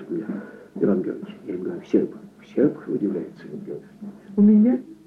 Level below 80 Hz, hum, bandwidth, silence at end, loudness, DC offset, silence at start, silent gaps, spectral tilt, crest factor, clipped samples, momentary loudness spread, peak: -66 dBFS; none; 4 kHz; 0.15 s; -23 LUFS; under 0.1%; 0 s; none; -10.5 dB/octave; 16 dB; under 0.1%; 20 LU; -8 dBFS